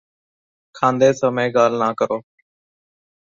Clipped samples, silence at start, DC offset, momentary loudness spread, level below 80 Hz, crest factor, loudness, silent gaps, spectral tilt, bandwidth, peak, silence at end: under 0.1%; 0.75 s; under 0.1%; 7 LU; -64 dBFS; 18 dB; -18 LUFS; none; -5.5 dB/octave; 7.6 kHz; -2 dBFS; 1.15 s